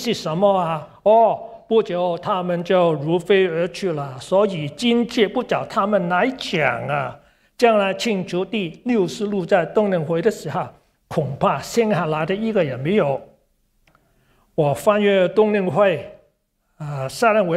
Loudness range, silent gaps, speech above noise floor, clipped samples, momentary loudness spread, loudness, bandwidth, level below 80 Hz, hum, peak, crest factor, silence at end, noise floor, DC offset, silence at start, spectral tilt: 3 LU; none; 48 dB; under 0.1%; 10 LU; -20 LUFS; 15 kHz; -58 dBFS; none; -2 dBFS; 18 dB; 0 s; -67 dBFS; under 0.1%; 0 s; -6 dB/octave